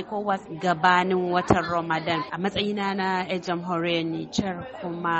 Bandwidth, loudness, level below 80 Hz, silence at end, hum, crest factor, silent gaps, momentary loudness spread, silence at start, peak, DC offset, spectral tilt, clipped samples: 8.2 kHz; -25 LUFS; -52 dBFS; 0 s; none; 22 dB; none; 8 LU; 0 s; -2 dBFS; under 0.1%; -5.5 dB/octave; under 0.1%